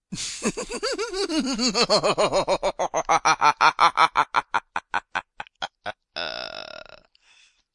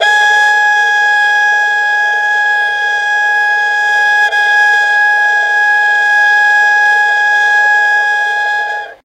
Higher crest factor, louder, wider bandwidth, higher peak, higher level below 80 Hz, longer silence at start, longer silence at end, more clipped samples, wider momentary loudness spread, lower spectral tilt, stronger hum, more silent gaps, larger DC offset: first, 20 dB vs 10 dB; second, -23 LUFS vs -9 LUFS; second, 11.5 kHz vs 13.5 kHz; second, -4 dBFS vs 0 dBFS; first, -52 dBFS vs -58 dBFS; about the same, 0.1 s vs 0 s; first, 0.95 s vs 0.1 s; neither; first, 16 LU vs 4 LU; first, -2.5 dB/octave vs 2.5 dB/octave; neither; neither; neither